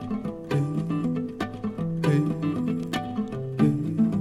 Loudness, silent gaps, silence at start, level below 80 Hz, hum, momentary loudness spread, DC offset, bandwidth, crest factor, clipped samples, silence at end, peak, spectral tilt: -27 LUFS; none; 0 s; -54 dBFS; none; 8 LU; under 0.1%; 13.5 kHz; 18 dB; under 0.1%; 0 s; -8 dBFS; -8 dB/octave